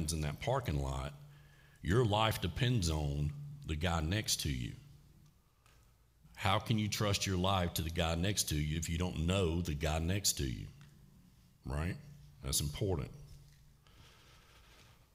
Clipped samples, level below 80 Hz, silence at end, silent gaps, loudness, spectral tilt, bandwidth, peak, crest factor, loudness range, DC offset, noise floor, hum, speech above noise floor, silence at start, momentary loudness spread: under 0.1%; -50 dBFS; 0.3 s; none; -35 LUFS; -4.5 dB/octave; 16 kHz; -14 dBFS; 22 dB; 7 LU; under 0.1%; -67 dBFS; none; 32 dB; 0 s; 14 LU